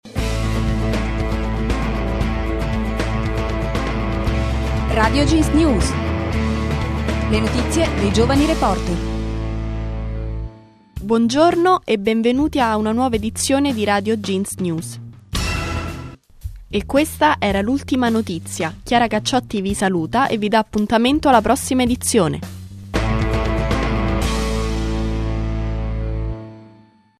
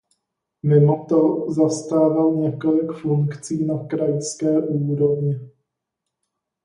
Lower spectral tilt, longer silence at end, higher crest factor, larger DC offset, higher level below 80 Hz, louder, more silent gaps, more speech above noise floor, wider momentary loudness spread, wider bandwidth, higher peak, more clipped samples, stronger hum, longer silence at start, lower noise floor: second, -5.5 dB/octave vs -8 dB/octave; second, 0.5 s vs 1.15 s; about the same, 18 dB vs 16 dB; neither; first, -26 dBFS vs -66 dBFS; about the same, -19 LUFS vs -20 LUFS; neither; second, 32 dB vs 62 dB; first, 11 LU vs 7 LU; first, 14 kHz vs 11 kHz; first, 0 dBFS vs -4 dBFS; neither; neither; second, 0.05 s vs 0.65 s; second, -49 dBFS vs -81 dBFS